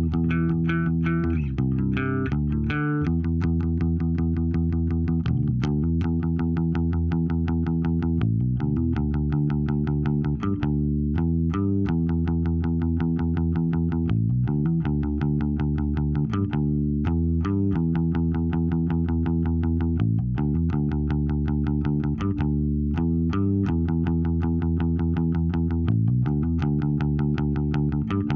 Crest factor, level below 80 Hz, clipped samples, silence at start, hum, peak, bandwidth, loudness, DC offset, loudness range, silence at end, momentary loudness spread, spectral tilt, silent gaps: 12 dB; -32 dBFS; under 0.1%; 0 s; none; -10 dBFS; 5 kHz; -24 LUFS; under 0.1%; 1 LU; 0 s; 1 LU; -10.5 dB/octave; none